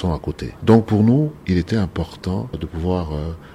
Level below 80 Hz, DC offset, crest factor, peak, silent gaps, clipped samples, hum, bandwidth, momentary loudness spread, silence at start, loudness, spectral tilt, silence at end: -36 dBFS; under 0.1%; 18 dB; -2 dBFS; none; under 0.1%; none; 11.5 kHz; 11 LU; 0 s; -20 LUFS; -8.5 dB/octave; 0 s